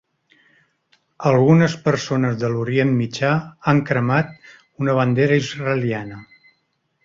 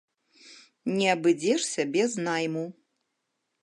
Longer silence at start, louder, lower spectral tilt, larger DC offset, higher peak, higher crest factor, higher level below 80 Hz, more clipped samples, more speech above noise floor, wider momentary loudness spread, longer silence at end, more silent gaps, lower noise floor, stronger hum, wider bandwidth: first, 1.2 s vs 0.45 s; first, -19 LUFS vs -27 LUFS; first, -7 dB/octave vs -4 dB/octave; neither; first, -2 dBFS vs -10 dBFS; about the same, 18 dB vs 20 dB; first, -56 dBFS vs -80 dBFS; neither; second, 50 dB vs 54 dB; about the same, 10 LU vs 11 LU; about the same, 0.8 s vs 0.9 s; neither; second, -69 dBFS vs -80 dBFS; neither; second, 7.6 kHz vs 11.5 kHz